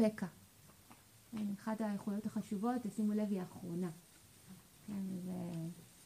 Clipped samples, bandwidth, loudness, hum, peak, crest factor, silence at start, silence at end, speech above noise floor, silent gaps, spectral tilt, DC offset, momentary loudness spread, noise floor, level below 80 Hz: under 0.1%; 15.5 kHz; -41 LUFS; none; -20 dBFS; 20 dB; 0 s; 0 s; 23 dB; none; -7 dB/octave; under 0.1%; 23 LU; -63 dBFS; -76 dBFS